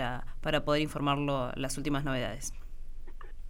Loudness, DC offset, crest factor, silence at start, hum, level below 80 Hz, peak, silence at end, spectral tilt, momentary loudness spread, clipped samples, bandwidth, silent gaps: -32 LUFS; under 0.1%; 18 dB; 0 s; none; -40 dBFS; -14 dBFS; 0 s; -5 dB/octave; 22 LU; under 0.1%; 16.5 kHz; none